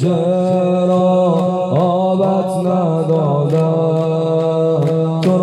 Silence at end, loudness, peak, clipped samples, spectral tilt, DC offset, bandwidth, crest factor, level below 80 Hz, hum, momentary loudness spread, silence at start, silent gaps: 0 s; -15 LUFS; -4 dBFS; under 0.1%; -9 dB/octave; under 0.1%; 11 kHz; 10 dB; -60 dBFS; none; 3 LU; 0 s; none